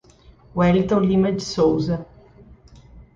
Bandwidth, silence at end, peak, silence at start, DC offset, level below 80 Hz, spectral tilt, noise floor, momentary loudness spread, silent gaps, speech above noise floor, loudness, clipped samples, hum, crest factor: 7.6 kHz; 0.15 s; -6 dBFS; 0.55 s; under 0.1%; -44 dBFS; -7 dB/octave; -50 dBFS; 9 LU; none; 31 dB; -20 LUFS; under 0.1%; none; 16 dB